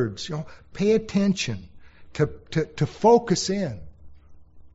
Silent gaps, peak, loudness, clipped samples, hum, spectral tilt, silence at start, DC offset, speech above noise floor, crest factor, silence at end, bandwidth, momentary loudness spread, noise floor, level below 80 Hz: none; -6 dBFS; -24 LUFS; under 0.1%; none; -5.5 dB/octave; 0 s; under 0.1%; 22 dB; 18 dB; 0.05 s; 8 kHz; 17 LU; -46 dBFS; -50 dBFS